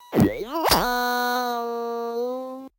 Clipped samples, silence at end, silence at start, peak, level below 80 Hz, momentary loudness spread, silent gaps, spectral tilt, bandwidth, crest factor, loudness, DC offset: under 0.1%; 0.1 s; 0 s; -6 dBFS; -46 dBFS; 8 LU; none; -4.5 dB/octave; 17 kHz; 18 dB; -24 LUFS; under 0.1%